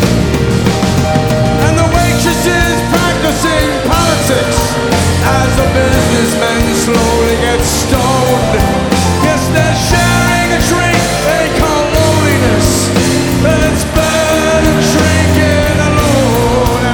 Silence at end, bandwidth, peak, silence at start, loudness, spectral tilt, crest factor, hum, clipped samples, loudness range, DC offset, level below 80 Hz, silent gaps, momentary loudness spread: 0 s; 19.5 kHz; 0 dBFS; 0 s; -10 LUFS; -4.5 dB/octave; 10 dB; none; under 0.1%; 1 LU; under 0.1%; -22 dBFS; none; 2 LU